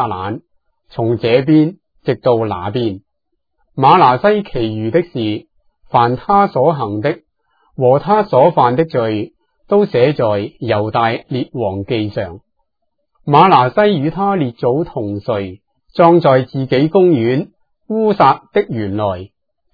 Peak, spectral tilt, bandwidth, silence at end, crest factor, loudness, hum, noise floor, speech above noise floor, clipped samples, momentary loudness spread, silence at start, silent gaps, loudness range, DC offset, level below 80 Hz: 0 dBFS; -9.5 dB/octave; 5.4 kHz; 0.5 s; 14 dB; -14 LUFS; none; -73 dBFS; 60 dB; under 0.1%; 13 LU; 0 s; none; 3 LU; under 0.1%; -48 dBFS